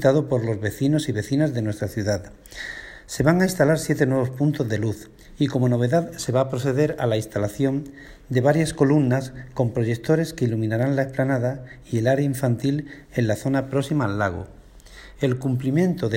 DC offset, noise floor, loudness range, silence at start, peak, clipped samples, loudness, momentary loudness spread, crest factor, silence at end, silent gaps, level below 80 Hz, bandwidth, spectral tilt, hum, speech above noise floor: under 0.1%; -45 dBFS; 2 LU; 0 s; -4 dBFS; under 0.1%; -23 LUFS; 10 LU; 18 dB; 0 s; none; -50 dBFS; 16.5 kHz; -7 dB/octave; none; 23 dB